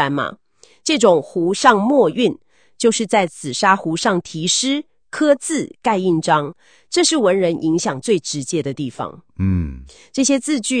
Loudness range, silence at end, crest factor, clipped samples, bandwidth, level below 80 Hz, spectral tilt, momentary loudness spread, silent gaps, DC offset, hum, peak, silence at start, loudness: 3 LU; 0 s; 18 dB; under 0.1%; 10 kHz; -46 dBFS; -4 dB/octave; 12 LU; none; 0.2%; none; 0 dBFS; 0 s; -18 LUFS